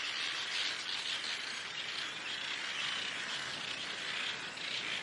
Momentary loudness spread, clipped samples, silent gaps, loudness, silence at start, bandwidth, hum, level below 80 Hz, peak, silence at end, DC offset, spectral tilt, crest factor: 4 LU; under 0.1%; none; -36 LUFS; 0 s; 11.5 kHz; none; -84 dBFS; -22 dBFS; 0 s; under 0.1%; 0 dB/octave; 16 dB